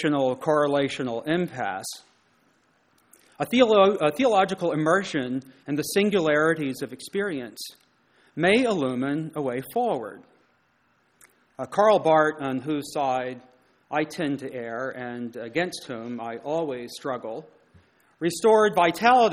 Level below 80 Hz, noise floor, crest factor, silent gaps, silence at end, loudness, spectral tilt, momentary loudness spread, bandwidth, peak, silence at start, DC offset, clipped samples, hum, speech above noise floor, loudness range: -66 dBFS; -66 dBFS; 20 dB; none; 0 s; -24 LUFS; -5 dB/octave; 15 LU; 16 kHz; -4 dBFS; 0 s; under 0.1%; under 0.1%; none; 42 dB; 8 LU